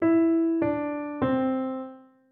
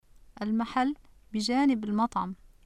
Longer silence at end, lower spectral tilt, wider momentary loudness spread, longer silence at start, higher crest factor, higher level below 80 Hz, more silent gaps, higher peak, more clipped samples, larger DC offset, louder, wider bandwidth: about the same, 0.3 s vs 0.2 s; first, -11 dB/octave vs -5 dB/octave; about the same, 12 LU vs 12 LU; second, 0 s vs 0.4 s; about the same, 12 dB vs 14 dB; about the same, -62 dBFS vs -58 dBFS; neither; about the same, -14 dBFS vs -16 dBFS; neither; neither; first, -26 LUFS vs -29 LUFS; second, 3.7 kHz vs 11.5 kHz